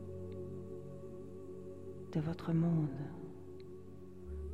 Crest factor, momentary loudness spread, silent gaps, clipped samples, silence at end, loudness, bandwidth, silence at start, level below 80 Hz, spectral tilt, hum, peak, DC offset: 16 dB; 17 LU; none; under 0.1%; 0 s; -41 LUFS; 6.6 kHz; 0 s; -58 dBFS; -9.5 dB/octave; none; -24 dBFS; 0.2%